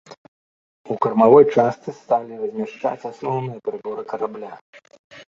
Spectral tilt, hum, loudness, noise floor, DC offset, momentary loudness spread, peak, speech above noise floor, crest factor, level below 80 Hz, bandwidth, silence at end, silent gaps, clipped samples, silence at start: -8 dB/octave; none; -20 LUFS; under -90 dBFS; under 0.1%; 18 LU; -2 dBFS; over 70 dB; 20 dB; -64 dBFS; 7.2 kHz; 0.1 s; 0.17-0.85 s, 4.61-4.73 s, 4.99-5.10 s; under 0.1%; 0.1 s